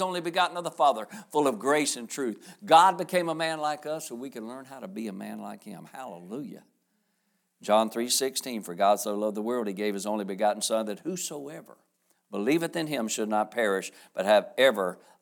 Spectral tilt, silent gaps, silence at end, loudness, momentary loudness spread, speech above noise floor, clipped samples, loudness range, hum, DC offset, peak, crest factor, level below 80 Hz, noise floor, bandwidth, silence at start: -3 dB/octave; none; 0.25 s; -27 LUFS; 17 LU; 47 dB; under 0.1%; 11 LU; none; under 0.1%; -6 dBFS; 22 dB; -86 dBFS; -75 dBFS; 20 kHz; 0 s